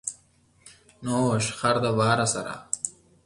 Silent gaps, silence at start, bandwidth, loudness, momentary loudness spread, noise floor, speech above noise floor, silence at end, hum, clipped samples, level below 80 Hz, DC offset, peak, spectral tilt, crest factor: none; 0.05 s; 11.5 kHz; -25 LUFS; 11 LU; -61 dBFS; 37 dB; 0.35 s; none; under 0.1%; -58 dBFS; under 0.1%; -8 dBFS; -4.5 dB/octave; 20 dB